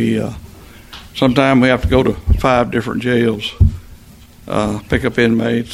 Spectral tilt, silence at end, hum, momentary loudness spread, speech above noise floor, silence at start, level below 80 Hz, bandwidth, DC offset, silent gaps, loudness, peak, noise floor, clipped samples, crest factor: -7 dB/octave; 0 s; none; 15 LU; 26 dB; 0 s; -24 dBFS; 15.5 kHz; under 0.1%; none; -15 LUFS; 0 dBFS; -41 dBFS; under 0.1%; 16 dB